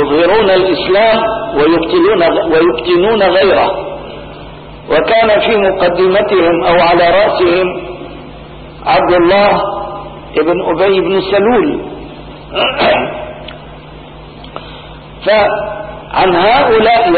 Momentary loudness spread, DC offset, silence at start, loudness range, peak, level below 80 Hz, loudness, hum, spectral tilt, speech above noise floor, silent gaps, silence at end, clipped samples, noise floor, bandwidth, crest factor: 21 LU; under 0.1%; 0 s; 6 LU; 0 dBFS; -36 dBFS; -10 LUFS; none; -11 dB/octave; 22 dB; none; 0 s; under 0.1%; -31 dBFS; 4.8 kHz; 10 dB